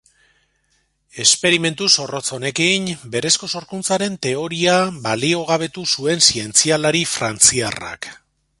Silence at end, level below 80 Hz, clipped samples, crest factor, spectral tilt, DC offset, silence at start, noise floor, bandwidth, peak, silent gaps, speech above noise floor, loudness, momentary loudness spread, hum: 0.45 s; -54 dBFS; under 0.1%; 20 dB; -2 dB/octave; under 0.1%; 1.15 s; -65 dBFS; 16 kHz; 0 dBFS; none; 46 dB; -16 LUFS; 11 LU; none